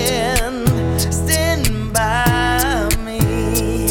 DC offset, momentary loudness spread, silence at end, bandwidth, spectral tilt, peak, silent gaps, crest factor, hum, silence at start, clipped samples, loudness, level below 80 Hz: under 0.1%; 3 LU; 0 s; 17.5 kHz; -4.5 dB/octave; 0 dBFS; none; 16 dB; none; 0 s; under 0.1%; -17 LUFS; -26 dBFS